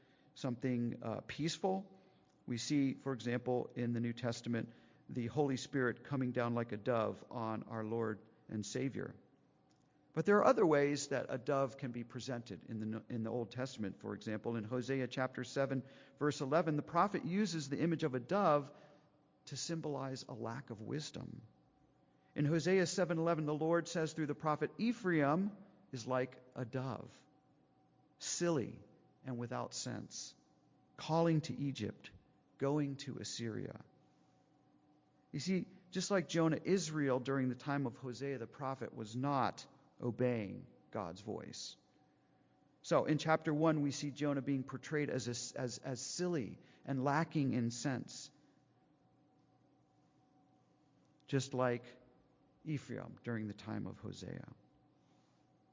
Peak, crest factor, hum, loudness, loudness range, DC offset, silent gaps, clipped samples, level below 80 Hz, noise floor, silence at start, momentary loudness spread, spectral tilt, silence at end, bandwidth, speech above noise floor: -16 dBFS; 22 dB; none; -39 LUFS; 8 LU; under 0.1%; none; under 0.1%; -76 dBFS; -72 dBFS; 0.35 s; 14 LU; -5.5 dB/octave; 1.25 s; 7.8 kHz; 34 dB